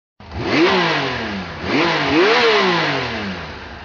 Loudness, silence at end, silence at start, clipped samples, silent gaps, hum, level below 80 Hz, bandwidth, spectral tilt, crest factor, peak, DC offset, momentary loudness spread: -17 LUFS; 0 s; 0.2 s; under 0.1%; none; none; -44 dBFS; 7.2 kHz; -2.5 dB/octave; 16 dB; -2 dBFS; under 0.1%; 14 LU